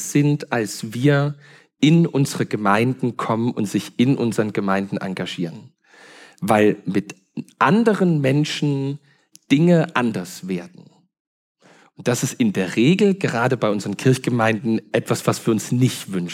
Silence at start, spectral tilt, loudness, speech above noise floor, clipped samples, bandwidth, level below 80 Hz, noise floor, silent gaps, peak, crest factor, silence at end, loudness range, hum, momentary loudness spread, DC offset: 0 s; -6 dB/octave; -20 LUFS; 28 dB; under 0.1%; 16 kHz; -72 dBFS; -47 dBFS; 11.20-11.55 s; -2 dBFS; 18 dB; 0 s; 4 LU; none; 11 LU; under 0.1%